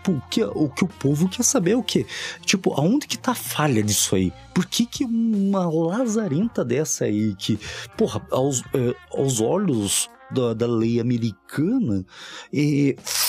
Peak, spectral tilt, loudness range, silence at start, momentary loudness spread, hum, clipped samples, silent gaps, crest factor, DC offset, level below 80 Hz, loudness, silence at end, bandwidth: -4 dBFS; -4.5 dB/octave; 2 LU; 0 s; 6 LU; none; under 0.1%; none; 18 dB; under 0.1%; -54 dBFS; -22 LUFS; 0 s; 16 kHz